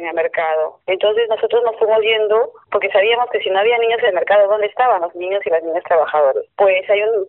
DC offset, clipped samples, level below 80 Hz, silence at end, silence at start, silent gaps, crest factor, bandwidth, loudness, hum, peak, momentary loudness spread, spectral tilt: under 0.1%; under 0.1%; -64 dBFS; 0 s; 0 s; none; 12 dB; 4.1 kHz; -16 LUFS; none; -4 dBFS; 5 LU; 1 dB/octave